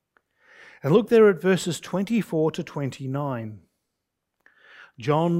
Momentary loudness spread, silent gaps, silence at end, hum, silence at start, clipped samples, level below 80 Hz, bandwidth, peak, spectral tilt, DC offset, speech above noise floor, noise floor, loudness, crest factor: 15 LU; none; 0 s; none; 0.85 s; under 0.1%; -66 dBFS; 16 kHz; -6 dBFS; -6.5 dB/octave; under 0.1%; 59 dB; -81 dBFS; -23 LUFS; 18 dB